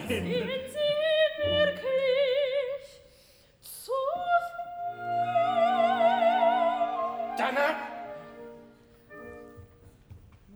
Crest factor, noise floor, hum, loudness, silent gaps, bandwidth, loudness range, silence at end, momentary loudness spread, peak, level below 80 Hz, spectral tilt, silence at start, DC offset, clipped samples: 16 dB; -59 dBFS; none; -27 LUFS; none; over 20 kHz; 7 LU; 0 s; 20 LU; -12 dBFS; -64 dBFS; -4.5 dB/octave; 0 s; under 0.1%; under 0.1%